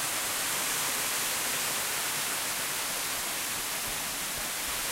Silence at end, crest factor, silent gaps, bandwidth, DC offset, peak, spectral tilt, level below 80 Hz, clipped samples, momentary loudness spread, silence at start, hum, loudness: 0 s; 14 dB; none; 16 kHz; under 0.1%; -18 dBFS; 0.5 dB/octave; -58 dBFS; under 0.1%; 3 LU; 0 s; none; -29 LUFS